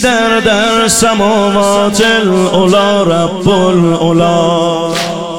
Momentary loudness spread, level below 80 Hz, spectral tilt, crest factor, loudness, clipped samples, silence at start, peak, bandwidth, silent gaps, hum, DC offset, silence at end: 3 LU; -38 dBFS; -4.5 dB/octave; 10 dB; -9 LUFS; under 0.1%; 0 s; 0 dBFS; 17 kHz; none; none; 2%; 0 s